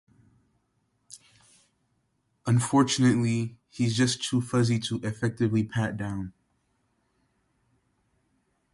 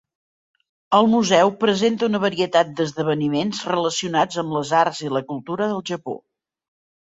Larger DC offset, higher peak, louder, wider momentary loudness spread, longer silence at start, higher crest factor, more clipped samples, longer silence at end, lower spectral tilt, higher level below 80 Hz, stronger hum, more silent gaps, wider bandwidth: neither; second, -10 dBFS vs -2 dBFS; second, -26 LUFS vs -20 LUFS; about the same, 12 LU vs 10 LU; first, 1.1 s vs 0.9 s; about the same, 18 dB vs 20 dB; neither; first, 2.45 s vs 0.95 s; about the same, -5.5 dB/octave vs -4.5 dB/octave; about the same, -60 dBFS vs -64 dBFS; neither; neither; first, 11.5 kHz vs 8 kHz